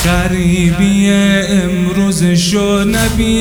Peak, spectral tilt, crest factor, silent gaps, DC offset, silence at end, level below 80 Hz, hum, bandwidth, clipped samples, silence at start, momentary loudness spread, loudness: 0 dBFS; -5 dB/octave; 10 dB; none; under 0.1%; 0 s; -24 dBFS; none; over 20 kHz; under 0.1%; 0 s; 3 LU; -12 LUFS